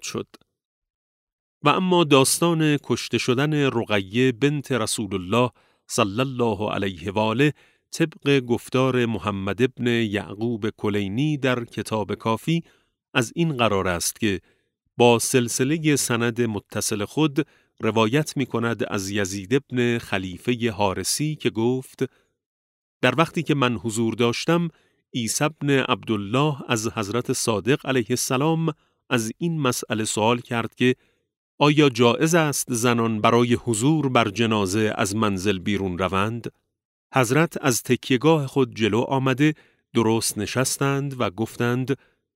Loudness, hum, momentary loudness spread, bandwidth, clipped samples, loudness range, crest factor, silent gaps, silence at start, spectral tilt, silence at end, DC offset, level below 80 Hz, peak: -22 LUFS; none; 7 LU; 16 kHz; under 0.1%; 4 LU; 20 dB; 0.65-0.82 s, 0.90-1.61 s, 22.46-23.01 s, 31.37-31.58 s, 36.85-37.10 s; 0.05 s; -4.5 dB/octave; 0.4 s; under 0.1%; -60 dBFS; -2 dBFS